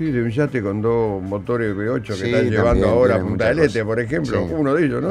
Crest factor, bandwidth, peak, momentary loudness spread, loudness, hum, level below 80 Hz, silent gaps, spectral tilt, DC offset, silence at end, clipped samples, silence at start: 16 dB; 11.5 kHz; -2 dBFS; 7 LU; -19 LUFS; none; -36 dBFS; none; -7.5 dB/octave; under 0.1%; 0 s; under 0.1%; 0 s